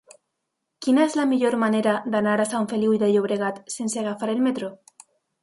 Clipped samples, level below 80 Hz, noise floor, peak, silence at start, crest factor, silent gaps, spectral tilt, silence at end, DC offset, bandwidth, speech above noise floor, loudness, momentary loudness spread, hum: under 0.1%; -70 dBFS; -79 dBFS; -8 dBFS; 0.8 s; 16 dB; none; -5 dB/octave; 0.65 s; under 0.1%; 11.5 kHz; 58 dB; -23 LUFS; 8 LU; none